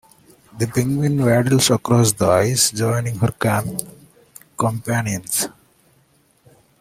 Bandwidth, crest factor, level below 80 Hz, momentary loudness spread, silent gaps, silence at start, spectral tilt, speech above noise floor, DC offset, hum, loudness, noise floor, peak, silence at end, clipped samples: 16.5 kHz; 20 dB; -52 dBFS; 9 LU; none; 0.55 s; -4.5 dB/octave; 40 dB; under 0.1%; none; -18 LUFS; -58 dBFS; 0 dBFS; 1.35 s; under 0.1%